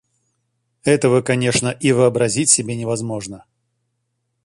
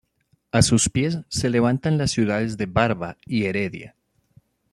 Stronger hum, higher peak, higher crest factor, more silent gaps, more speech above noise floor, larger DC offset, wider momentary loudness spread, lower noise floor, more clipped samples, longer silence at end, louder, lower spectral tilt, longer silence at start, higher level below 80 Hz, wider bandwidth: neither; about the same, 0 dBFS vs -2 dBFS; about the same, 20 dB vs 20 dB; neither; first, 55 dB vs 45 dB; neither; about the same, 11 LU vs 9 LU; first, -72 dBFS vs -67 dBFS; neither; first, 1.05 s vs 0.85 s; first, -17 LUFS vs -22 LUFS; about the same, -4 dB/octave vs -5 dB/octave; first, 0.85 s vs 0.55 s; second, -54 dBFS vs -46 dBFS; about the same, 11.5 kHz vs 12.5 kHz